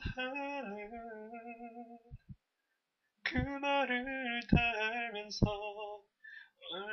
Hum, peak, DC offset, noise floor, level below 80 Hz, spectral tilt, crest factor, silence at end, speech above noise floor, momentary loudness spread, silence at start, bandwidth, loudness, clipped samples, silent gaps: none; -14 dBFS; under 0.1%; -85 dBFS; -50 dBFS; -4 dB/octave; 24 dB; 0 s; 49 dB; 21 LU; 0 s; 6.6 kHz; -36 LUFS; under 0.1%; none